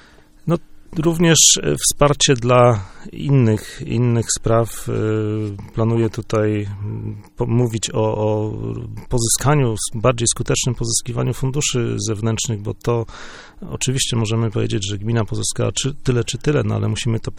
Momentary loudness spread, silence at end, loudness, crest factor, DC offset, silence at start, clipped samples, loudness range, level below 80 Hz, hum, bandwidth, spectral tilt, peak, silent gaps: 13 LU; 0 s; -18 LUFS; 18 dB; under 0.1%; 0.45 s; under 0.1%; 7 LU; -36 dBFS; none; 16.5 kHz; -4.5 dB/octave; 0 dBFS; none